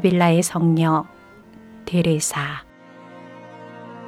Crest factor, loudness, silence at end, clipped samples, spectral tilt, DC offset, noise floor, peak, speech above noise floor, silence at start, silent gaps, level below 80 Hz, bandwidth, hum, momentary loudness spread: 18 dB; -20 LUFS; 0 s; under 0.1%; -5.5 dB/octave; under 0.1%; -45 dBFS; -4 dBFS; 27 dB; 0 s; none; -56 dBFS; 15 kHz; none; 24 LU